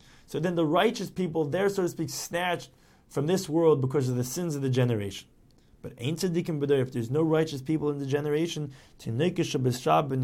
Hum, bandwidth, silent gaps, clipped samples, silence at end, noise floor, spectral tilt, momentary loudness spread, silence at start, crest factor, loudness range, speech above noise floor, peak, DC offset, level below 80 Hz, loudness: none; 17 kHz; none; under 0.1%; 0 s; -58 dBFS; -6 dB/octave; 11 LU; 0.3 s; 18 dB; 2 LU; 31 dB; -10 dBFS; under 0.1%; -60 dBFS; -28 LUFS